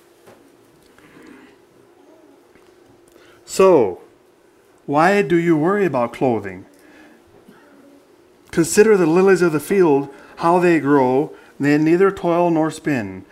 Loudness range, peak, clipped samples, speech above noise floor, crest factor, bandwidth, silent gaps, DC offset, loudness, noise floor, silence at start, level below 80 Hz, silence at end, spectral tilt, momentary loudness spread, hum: 6 LU; 0 dBFS; under 0.1%; 37 dB; 18 dB; 15.5 kHz; none; under 0.1%; -17 LUFS; -53 dBFS; 3.5 s; -58 dBFS; 0.1 s; -6 dB/octave; 12 LU; none